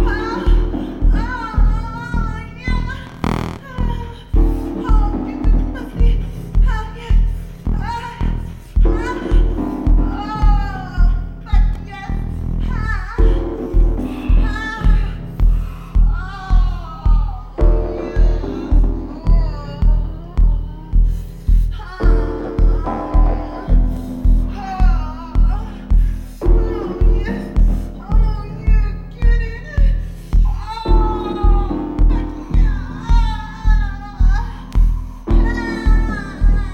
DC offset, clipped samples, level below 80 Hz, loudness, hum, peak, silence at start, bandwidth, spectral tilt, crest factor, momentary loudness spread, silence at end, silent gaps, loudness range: under 0.1%; under 0.1%; -16 dBFS; -20 LUFS; none; -2 dBFS; 0 s; 5.2 kHz; -8 dB/octave; 14 dB; 6 LU; 0 s; none; 2 LU